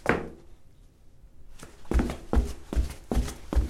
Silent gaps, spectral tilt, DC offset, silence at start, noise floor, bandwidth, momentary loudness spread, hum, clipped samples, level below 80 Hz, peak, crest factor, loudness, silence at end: none; -6.5 dB/octave; under 0.1%; 0.05 s; -52 dBFS; 14.5 kHz; 20 LU; none; under 0.1%; -32 dBFS; -6 dBFS; 24 dB; -31 LUFS; 0 s